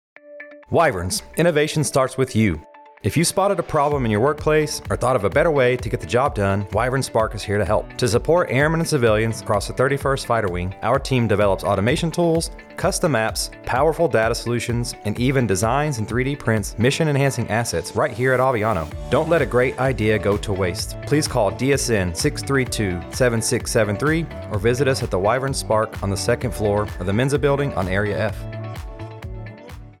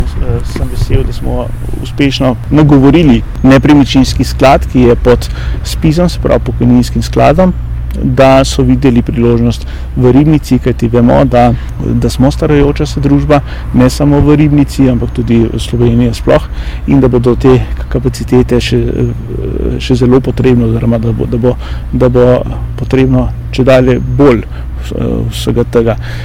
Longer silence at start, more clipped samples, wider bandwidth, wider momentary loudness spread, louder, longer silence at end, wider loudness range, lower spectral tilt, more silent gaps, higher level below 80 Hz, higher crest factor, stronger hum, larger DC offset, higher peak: first, 0.25 s vs 0 s; second, under 0.1% vs 5%; about the same, 16.5 kHz vs 16 kHz; second, 6 LU vs 10 LU; second, -20 LUFS vs -9 LUFS; about the same, 0.1 s vs 0 s; about the same, 1 LU vs 3 LU; second, -5 dB/octave vs -7.5 dB/octave; neither; second, -38 dBFS vs -18 dBFS; first, 14 dB vs 8 dB; neither; second, under 0.1% vs 0.6%; second, -6 dBFS vs 0 dBFS